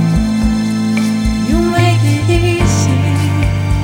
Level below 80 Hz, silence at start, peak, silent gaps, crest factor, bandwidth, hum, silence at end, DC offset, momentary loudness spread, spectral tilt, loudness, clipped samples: -22 dBFS; 0 s; 0 dBFS; none; 12 dB; 16.5 kHz; none; 0 s; under 0.1%; 3 LU; -6 dB/octave; -13 LUFS; under 0.1%